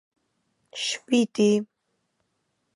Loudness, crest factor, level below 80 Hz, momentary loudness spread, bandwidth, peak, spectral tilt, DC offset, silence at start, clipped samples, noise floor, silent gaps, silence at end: -24 LUFS; 18 dB; -76 dBFS; 17 LU; 11.5 kHz; -8 dBFS; -4.5 dB/octave; under 0.1%; 0.75 s; under 0.1%; -76 dBFS; none; 1.1 s